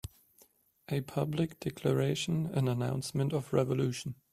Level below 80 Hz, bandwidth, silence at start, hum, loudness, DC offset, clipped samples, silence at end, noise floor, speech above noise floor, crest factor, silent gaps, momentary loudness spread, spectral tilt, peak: -62 dBFS; 14.5 kHz; 0.05 s; none; -33 LUFS; under 0.1%; under 0.1%; 0.2 s; -66 dBFS; 34 dB; 20 dB; none; 6 LU; -6.5 dB/octave; -14 dBFS